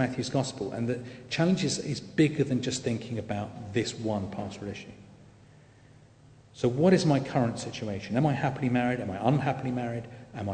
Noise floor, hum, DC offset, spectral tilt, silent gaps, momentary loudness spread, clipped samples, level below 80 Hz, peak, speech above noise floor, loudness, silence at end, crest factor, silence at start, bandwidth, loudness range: -55 dBFS; 50 Hz at -50 dBFS; under 0.1%; -6 dB/octave; none; 11 LU; under 0.1%; -60 dBFS; -8 dBFS; 27 dB; -29 LUFS; 0 s; 20 dB; 0 s; 9.4 kHz; 8 LU